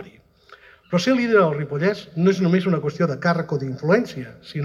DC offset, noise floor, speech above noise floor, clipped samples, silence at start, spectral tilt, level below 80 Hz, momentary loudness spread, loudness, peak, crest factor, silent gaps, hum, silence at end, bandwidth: under 0.1%; -50 dBFS; 30 dB; under 0.1%; 0 s; -7 dB/octave; -60 dBFS; 8 LU; -21 LUFS; -4 dBFS; 16 dB; none; none; 0 s; 11 kHz